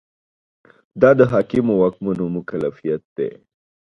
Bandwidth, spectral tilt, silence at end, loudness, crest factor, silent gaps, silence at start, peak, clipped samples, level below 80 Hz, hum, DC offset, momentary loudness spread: 6.2 kHz; -9.5 dB/octave; 0.65 s; -19 LUFS; 20 dB; 3.05-3.16 s; 0.95 s; 0 dBFS; under 0.1%; -54 dBFS; none; under 0.1%; 13 LU